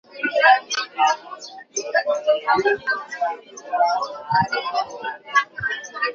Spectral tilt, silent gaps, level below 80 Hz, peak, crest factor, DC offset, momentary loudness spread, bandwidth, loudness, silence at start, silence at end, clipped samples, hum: -2.5 dB/octave; none; -62 dBFS; -2 dBFS; 20 dB; under 0.1%; 12 LU; 7.4 kHz; -21 LUFS; 0.1 s; 0 s; under 0.1%; none